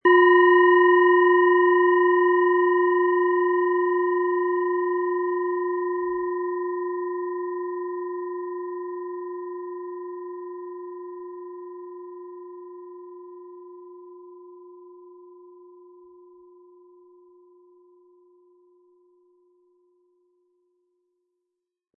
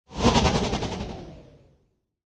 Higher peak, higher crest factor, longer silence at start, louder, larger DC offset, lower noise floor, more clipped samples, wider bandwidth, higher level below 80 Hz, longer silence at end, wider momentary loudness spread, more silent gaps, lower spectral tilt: about the same, -6 dBFS vs -6 dBFS; about the same, 18 dB vs 20 dB; about the same, 0.05 s vs 0.1 s; first, -21 LUFS vs -24 LUFS; neither; first, -83 dBFS vs -69 dBFS; neither; second, 3.1 kHz vs 11 kHz; second, -78 dBFS vs -38 dBFS; first, 6.85 s vs 0.85 s; first, 25 LU vs 20 LU; neither; first, -7 dB/octave vs -5 dB/octave